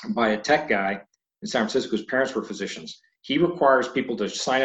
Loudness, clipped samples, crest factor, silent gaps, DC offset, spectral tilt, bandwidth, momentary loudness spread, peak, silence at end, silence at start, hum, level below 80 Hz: -24 LUFS; under 0.1%; 18 dB; none; under 0.1%; -4 dB/octave; 8.6 kHz; 15 LU; -6 dBFS; 0 s; 0 s; none; -62 dBFS